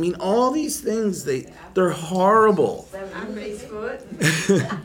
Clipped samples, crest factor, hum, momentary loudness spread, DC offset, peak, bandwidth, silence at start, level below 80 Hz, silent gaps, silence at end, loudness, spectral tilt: under 0.1%; 16 dB; none; 16 LU; under 0.1%; -4 dBFS; 17.5 kHz; 0 s; -54 dBFS; none; 0 s; -21 LUFS; -5 dB/octave